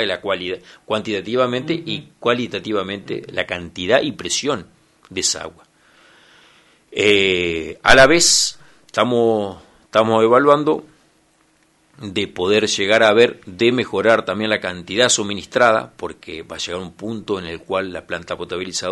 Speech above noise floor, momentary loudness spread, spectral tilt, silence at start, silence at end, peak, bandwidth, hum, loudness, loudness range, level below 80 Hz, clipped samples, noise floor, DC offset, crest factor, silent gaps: 40 dB; 15 LU; -3 dB/octave; 0 s; 0 s; 0 dBFS; 11.5 kHz; none; -18 LUFS; 7 LU; -46 dBFS; under 0.1%; -58 dBFS; under 0.1%; 18 dB; none